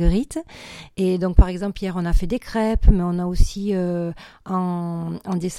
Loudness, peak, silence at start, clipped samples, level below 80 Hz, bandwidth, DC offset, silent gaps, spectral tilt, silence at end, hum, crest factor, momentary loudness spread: -23 LUFS; 0 dBFS; 0 s; under 0.1%; -22 dBFS; 12.5 kHz; under 0.1%; none; -7 dB/octave; 0 s; none; 20 dB; 12 LU